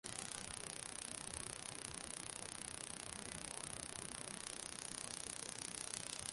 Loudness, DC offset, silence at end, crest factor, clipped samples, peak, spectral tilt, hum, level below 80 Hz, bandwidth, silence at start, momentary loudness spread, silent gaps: -47 LUFS; under 0.1%; 0 s; 30 dB; under 0.1%; -20 dBFS; -1.5 dB/octave; none; -68 dBFS; 12 kHz; 0.05 s; 2 LU; none